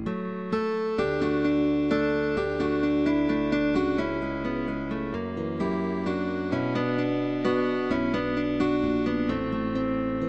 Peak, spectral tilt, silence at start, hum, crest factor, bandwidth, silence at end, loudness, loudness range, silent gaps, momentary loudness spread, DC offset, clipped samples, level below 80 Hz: -12 dBFS; -7.5 dB/octave; 0 s; none; 14 dB; 8 kHz; 0 s; -27 LUFS; 3 LU; none; 6 LU; 0.3%; under 0.1%; -46 dBFS